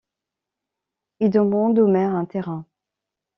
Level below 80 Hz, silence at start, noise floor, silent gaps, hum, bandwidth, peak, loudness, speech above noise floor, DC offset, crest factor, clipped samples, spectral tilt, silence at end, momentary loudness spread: -66 dBFS; 1.2 s; -86 dBFS; none; none; 5.8 kHz; -6 dBFS; -20 LUFS; 67 dB; under 0.1%; 18 dB; under 0.1%; -9 dB/octave; 0.75 s; 12 LU